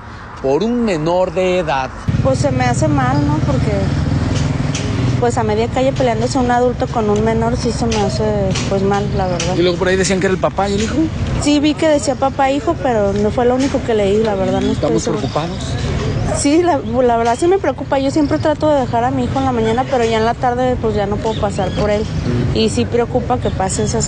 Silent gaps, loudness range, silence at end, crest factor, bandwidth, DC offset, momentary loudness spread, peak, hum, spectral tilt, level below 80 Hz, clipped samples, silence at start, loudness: none; 1 LU; 0 s; 12 dB; 11 kHz; under 0.1%; 4 LU; -2 dBFS; none; -6 dB/octave; -30 dBFS; under 0.1%; 0 s; -16 LUFS